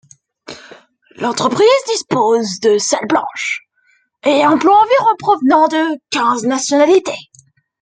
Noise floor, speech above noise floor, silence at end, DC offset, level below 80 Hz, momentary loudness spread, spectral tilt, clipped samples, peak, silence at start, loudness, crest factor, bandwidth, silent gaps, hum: -58 dBFS; 45 dB; 0.6 s; under 0.1%; -62 dBFS; 13 LU; -3.5 dB/octave; under 0.1%; 0 dBFS; 0.5 s; -14 LUFS; 14 dB; 9.6 kHz; none; none